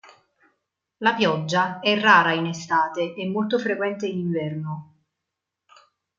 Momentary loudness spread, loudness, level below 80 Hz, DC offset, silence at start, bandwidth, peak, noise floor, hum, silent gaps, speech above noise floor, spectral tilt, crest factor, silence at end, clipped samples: 12 LU; -22 LUFS; -72 dBFS; under 0.1%; 1 s; 7.6 kHz; -2 dBFS; -84 dBFS; none; none; 62 dB; -5 dB/octave; 22 dB; 1.35 s; under 0.1%